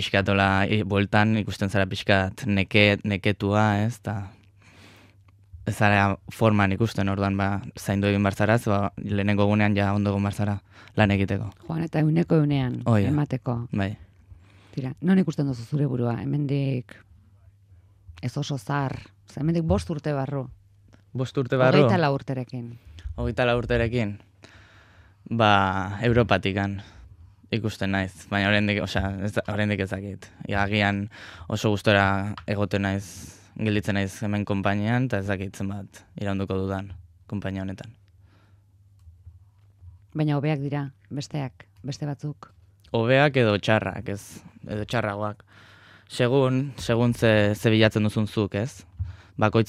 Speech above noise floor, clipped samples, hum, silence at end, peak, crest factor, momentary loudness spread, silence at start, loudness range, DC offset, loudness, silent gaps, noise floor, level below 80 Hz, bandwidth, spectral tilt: 33 dB; under 0.1%; none; 0.05 s; -2 dBFS; 22 dB; 15 LU; 0 s; 8 LU; under 0.1%; -24 LUFS; none; -57 dBFS; -50 dBFS; 14 kHz; -6.5 dB/octave